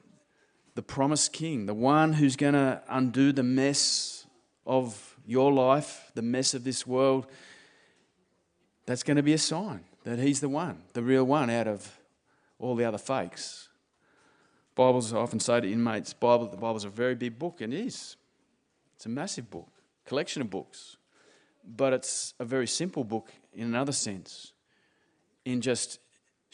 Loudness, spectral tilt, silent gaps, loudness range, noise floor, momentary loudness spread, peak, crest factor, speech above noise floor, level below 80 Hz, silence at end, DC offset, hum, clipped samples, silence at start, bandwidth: -28 LUFS; -4.5 dB/octave; none; 10 LU; -73 dBFS; 18 LU; -8 dBFS; 20 dB; 45 dB; -74 dBFS; 0.55 s; under 0.1%; none; under 0.1%; 0.75 s; 10.5 kHz